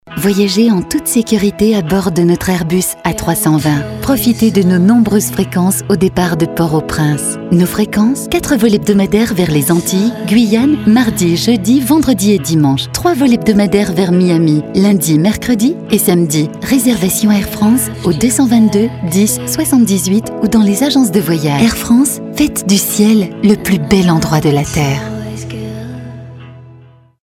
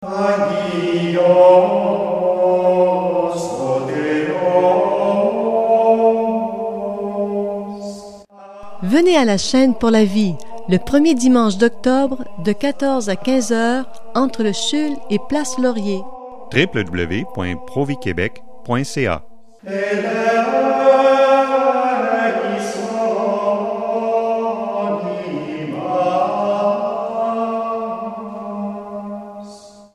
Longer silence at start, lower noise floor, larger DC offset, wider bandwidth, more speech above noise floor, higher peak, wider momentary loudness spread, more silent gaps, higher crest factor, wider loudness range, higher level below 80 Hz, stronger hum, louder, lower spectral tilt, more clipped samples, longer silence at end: about the same, 0.05 s vs 0 s; about the same, -40 dBFS vs -39 dBFS; neither; first, 16.5 kHz vs 12.5 kHz; first, 30 dB vs 23 dB; about the same, 0 dBFS vs 0 dBFS; second, 5 LU vs 13 LU; neither; about the same, 12 dB vs 16 dB; second, 2 LU vs 6 LU; first, -36 dBFS vs -50 dBFS; neither; first, -11 LUFS vs -17 LUFS; about the same, -5.5 dB/octave vs -5.5 dB/octave; neither; first, 0.5 s vs 0 s